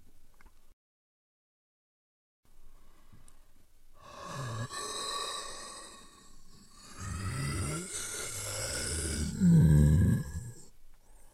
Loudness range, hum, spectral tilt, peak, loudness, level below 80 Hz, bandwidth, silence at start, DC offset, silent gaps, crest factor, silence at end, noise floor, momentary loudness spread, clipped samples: 14 LU; none; -5 dB/octave; -12 dBFS; -31 LUFS; -46 dBFS; 14.5 kHz; 0 s; under 0.1%; 0.73-2.43 s; 20 dB; 0.05 s; -54 dBFS; 23 LU; under 0.1%